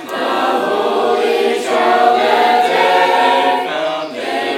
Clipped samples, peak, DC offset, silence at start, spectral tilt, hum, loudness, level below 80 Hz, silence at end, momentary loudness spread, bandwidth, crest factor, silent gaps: under 0.1%; 0 dBFS; under 0.1%; 0 s; -3 dB/octave; none; -14 LUFS; -70 dBFS; 0 s; 7 LU; 16.5 kHz; 14 dB; none